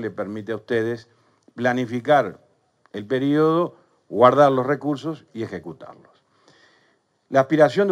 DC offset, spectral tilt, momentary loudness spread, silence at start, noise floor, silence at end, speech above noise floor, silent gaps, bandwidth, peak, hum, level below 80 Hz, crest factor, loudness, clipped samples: under 0.1%; -7 dB/octave; 16 LU; 0 s; -64 dBFS; 0 s; 44 dB; none; 10.5 kHz; 0 dBFS; none; -70 dBFS; 22 dB; -21 LUFS; under 0.1%